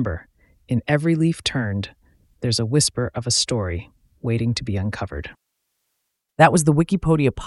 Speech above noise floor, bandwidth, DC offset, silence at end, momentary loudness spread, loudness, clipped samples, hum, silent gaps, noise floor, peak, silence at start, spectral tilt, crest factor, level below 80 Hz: 55 dB; 12 kHz; under 0.1%; 0 s; 15 LU; -21 LUFS; under 0.1%; none; none; -76 dBFS; 0 dBFS; 0 s; -5 dB/octave; 20 dB; -42 dBFS